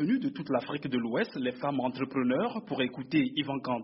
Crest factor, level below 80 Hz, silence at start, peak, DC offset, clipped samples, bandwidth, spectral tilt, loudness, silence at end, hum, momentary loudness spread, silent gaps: 16 dB; -70 dBFS; 0 s; -14 dBFS; under 0.1%; under 0.1%; 5.8 kHz; -4.5 dB/octave; -31 LUFS; 0 s; none; 4 LU; none